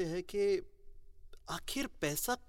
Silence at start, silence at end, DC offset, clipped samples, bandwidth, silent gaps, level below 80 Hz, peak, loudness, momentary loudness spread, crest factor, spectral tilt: 0 s; 0.05 s; under 0.1%; under 0.1%; 16.5 kHz; none; -54 dBFS; -20 dBFS; -36 LUFS; 10 LU; 18 dB; -3.5 dB/octave